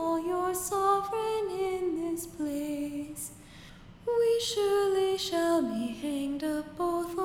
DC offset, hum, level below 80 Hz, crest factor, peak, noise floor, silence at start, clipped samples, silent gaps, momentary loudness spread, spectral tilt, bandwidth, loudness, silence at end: under 0.1%; none; -58 dBFS; 16 dB; -14 dBFS; -50 dBFS; 0 s; under 0.1%; none; 11 LU; -3.5 dB/octave; 17.5 kHz; -30 LUFS; 0 s